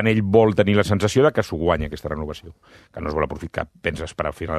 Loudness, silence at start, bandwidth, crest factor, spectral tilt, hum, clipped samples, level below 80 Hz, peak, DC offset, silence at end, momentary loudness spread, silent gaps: -21 LUFS; 0 s; 14 kHz; 20 dB; -6.5 dB/octave; none; under 0.1%; -42 dBFS; 0 dBFS; under 0.1%; 0 s; 13 LU; none